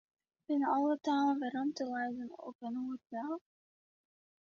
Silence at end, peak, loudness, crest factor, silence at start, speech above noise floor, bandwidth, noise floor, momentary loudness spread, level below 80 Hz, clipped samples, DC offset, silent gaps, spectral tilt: 1.05 s; -22 dBFS; -36 LUFS; 14 dB; 0.5 s; over 55 dB; 7.2 kHz; under -90 dBFS; 12 LU; -84 dBFS; under 0.1%; under 0.1%; 2.55-2.59 s; -3 dB/octave